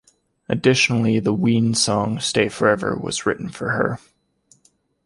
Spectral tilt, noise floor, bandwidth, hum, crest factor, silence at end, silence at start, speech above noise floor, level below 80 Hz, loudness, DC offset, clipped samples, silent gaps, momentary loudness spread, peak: -4.5 dB/octave; -61 dBFS; 11.5 kHz; none; 18 dB; 1.1 s; 0.5 s; 42 dB; -52 dBFS; -20 LUFS; under 0.1%; under 0.1%; none; 8 LU; -2 dBFS